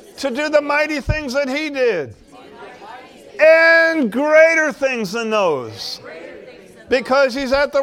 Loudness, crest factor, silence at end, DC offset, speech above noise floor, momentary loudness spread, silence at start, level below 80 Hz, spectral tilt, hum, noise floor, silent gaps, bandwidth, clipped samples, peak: -16 LUFS; 18 dB; 0 s; under 0.1%; 24 dB; 21 LU; 0.15 s; -40 dBFS; -4.5 dB/octave; none; -40 dBFS; none; 15 kHz; under 0.1%; 0 dBFS